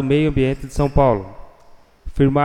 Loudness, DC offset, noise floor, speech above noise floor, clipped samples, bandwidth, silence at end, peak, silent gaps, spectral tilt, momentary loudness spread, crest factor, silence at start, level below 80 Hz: -18 LUFS; under 0.1%; -46 dBFS; 30 dB; under 0.1%; 11.5 kHz; 0 s; -2 dBFS; none; -8 dB/octave; 12 LU; 18 dB; 0 s; -30 dBFS